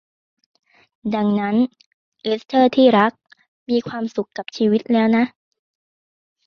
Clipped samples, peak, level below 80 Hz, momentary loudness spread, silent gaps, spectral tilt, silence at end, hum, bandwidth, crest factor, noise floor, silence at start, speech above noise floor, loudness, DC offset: under 0.1%; -2 dBFS; -64 dBFS; 12 LU; 1.86-2.12 s, 3.48-3.66 s; -7 dB/octave; 1.2 s; none; 6.6 kHz; 18 dB; under -90 dBFS; 1.05 s; over 72 dB; -19 LUFS; under 0.1%